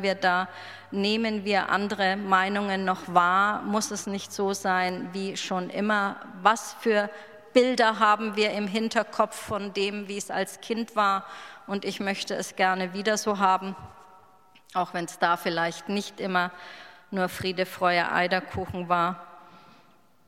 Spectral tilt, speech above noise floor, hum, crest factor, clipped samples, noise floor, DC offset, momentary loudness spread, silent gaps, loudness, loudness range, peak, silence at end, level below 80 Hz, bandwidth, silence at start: -4 dB/octave; 34 dB; none; 22 dB; under 0.1%; -60 dBFS; under 0.1%; 10 LU; none; -26 LUFS; 4 LU; -4 dBFS; 0.7 s; -64 dBFS; 16 kHz; 0 s